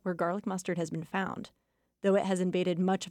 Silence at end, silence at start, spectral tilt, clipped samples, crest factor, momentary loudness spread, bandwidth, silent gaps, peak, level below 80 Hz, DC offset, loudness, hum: 0 s; 0.05 s; -6 dB/octave; under 0.1%; 14 dB; 8 LU; 12.5 kHz; none; -18 dBFS; -72 dBFS; under 0.1%; -31 LUFS; none